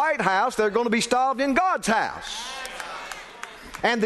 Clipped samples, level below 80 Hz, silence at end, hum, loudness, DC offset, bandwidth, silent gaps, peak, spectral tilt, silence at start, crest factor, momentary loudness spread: under 0.1%; -54 dBFS; 0 s; none; -24 LUFS; under 0.1%; 12.5 kHz; none; -6 dBFS; -3.5 dB/octave; 0 s; 18 dB; 15 LU